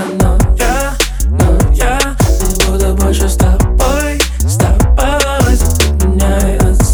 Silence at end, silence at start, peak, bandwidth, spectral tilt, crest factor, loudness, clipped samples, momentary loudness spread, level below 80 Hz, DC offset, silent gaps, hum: 0 s; 0 s; 0 dBFS; over 20 kHz; -5 dB/octave; 10 dB; -12 LUFS; under 0.1%; 2 LU; -12 dBFS; under 0.1%; none; none